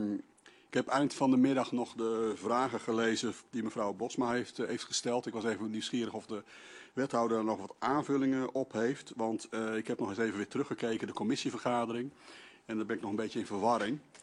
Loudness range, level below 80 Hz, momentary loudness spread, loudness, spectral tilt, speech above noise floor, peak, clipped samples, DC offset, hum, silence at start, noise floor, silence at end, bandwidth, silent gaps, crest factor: 4 LU; -76 dBFS; 8 LU; -34 LUFS; -4.5 dB/octave; 28 dB; -16 dBFS; under 0.1%; under 0.1%; none; 0 s; -61 dBFS; 0.05 s; 11.5 kHz; none; 18 dB